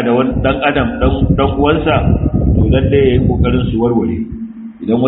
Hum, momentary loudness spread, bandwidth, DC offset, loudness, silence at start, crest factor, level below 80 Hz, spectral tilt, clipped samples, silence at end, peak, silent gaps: none; 9 LU; 4 kHz; under 0.1%; -13 LUFS; 0 s; 12 dB; -22 dBFS; -6.5 dB/octave; under 0.1%; 0 s; 0 dBFS; none